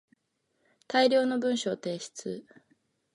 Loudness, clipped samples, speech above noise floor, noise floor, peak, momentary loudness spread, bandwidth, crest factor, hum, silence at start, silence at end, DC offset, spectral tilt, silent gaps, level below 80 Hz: -28 LUFS; under 0.1%; 49 dB; -77 dBFS; -12 dBFS; 15 LU; 11.5 kHz; 20 dB; none; 0.9 s; 0.75 s; under 0.1%; -4 dB/octave; none; -80 dBFS